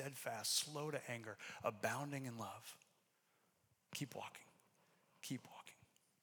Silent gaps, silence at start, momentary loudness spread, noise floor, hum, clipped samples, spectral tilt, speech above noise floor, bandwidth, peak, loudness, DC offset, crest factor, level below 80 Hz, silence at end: none; 0 s; 20 LU; -80 dBFS; none; under 0.1%; -3 dB/octave; 34 dB; over 20 kHz; -26 dBFS; -46 LUFS; under 0.1%; 24 dB; under -90 dBFS; 0.5 s